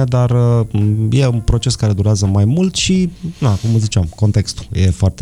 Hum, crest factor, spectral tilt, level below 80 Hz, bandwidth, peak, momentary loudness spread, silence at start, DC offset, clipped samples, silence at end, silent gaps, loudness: none; 12 dB; -6 dB/octave; -30 dBFS; 11 kHz; -2 dBFS; 4 LU; 0 s; under 0.1%; under 0.1%; 0 s; none; -15 LUFS